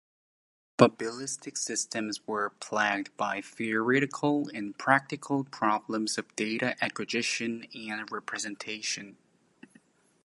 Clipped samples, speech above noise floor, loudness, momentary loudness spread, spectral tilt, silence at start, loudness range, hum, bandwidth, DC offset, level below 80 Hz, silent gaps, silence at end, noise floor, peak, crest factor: under 0.1%; 32 dB; -30 LUFS; 10 LU; -3.5 dB/octave; 0.8 s; 4 LU; none; 11.5 kHz; under 0.1%; -78 dBFS; none; 1.1 s; -63 dBFS; -2 dBFS; 28 dB